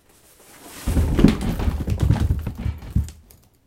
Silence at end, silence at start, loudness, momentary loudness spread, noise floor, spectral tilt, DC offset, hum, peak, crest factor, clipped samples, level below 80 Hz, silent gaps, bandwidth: 0.55 s; 0.6 s; -22 LUFS; 13 LU; -52 dBFS; -7 dB/octave; under 0.1%; none; 0 dBFS; 22 dB; under 0.1%; -26 dBFS; none; 16.5 kHz